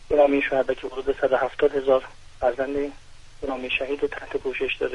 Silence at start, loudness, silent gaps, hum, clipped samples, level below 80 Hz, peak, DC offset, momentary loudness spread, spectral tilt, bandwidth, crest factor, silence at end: 0 s; -24 LUFS; none; none; under 0.1%; -46 dBFS; -6 dBFS; under 0.1%; 11 LU; -5.5 dB/octave; 10.5 kHz; 18 dB; 0 s